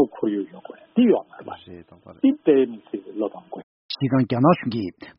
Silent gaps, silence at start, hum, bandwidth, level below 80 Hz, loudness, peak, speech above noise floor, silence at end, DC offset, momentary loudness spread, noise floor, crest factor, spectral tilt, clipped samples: 3.63-3.89 s; 0 s; none; 5.8 kHz; -64 dBFS; -22 LUFS; -4 dBFS; 24 dB; 0.1 s; under 0.1%; 20 LU; -44 dBFS; 18 dB; -6.5 dB/octave; under 0.1%